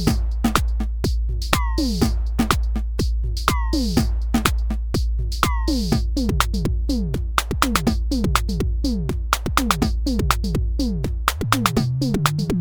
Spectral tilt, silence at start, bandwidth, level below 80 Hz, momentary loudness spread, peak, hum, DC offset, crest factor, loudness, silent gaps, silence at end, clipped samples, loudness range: -5 dB/octave; 0 s; over 20 kHz; -24 dBFS; 4 LU; 0 dBFS; none; under 0.1%; 20 dB; -22 LUFS; none; 0 s; under 0.1%; 1 LU